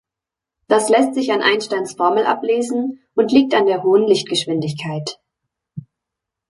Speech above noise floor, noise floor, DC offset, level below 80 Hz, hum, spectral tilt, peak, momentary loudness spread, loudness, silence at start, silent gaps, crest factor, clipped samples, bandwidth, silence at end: 69 dB; -86 dBFS; under 0.1%; -64 dBFS; none; -4.5 dB/octave; -2 dBFS; 13 LU; -17 LUFS; 0.7 s; none; 16 dB; under 0.1%; 11.5 kHz; 0.7 s